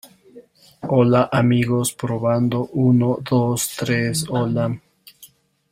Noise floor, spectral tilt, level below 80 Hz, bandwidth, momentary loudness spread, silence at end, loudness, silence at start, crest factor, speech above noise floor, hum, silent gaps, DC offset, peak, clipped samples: -50 dBFS; -6 dB/octave; -54 dBFS; 16 kHz; 7 LU; 0.45 s; -19 LUFS; 0.35 s; 16 dB; 31 dB; none; none; under 0.1%; -4 dBFS; under 0.1%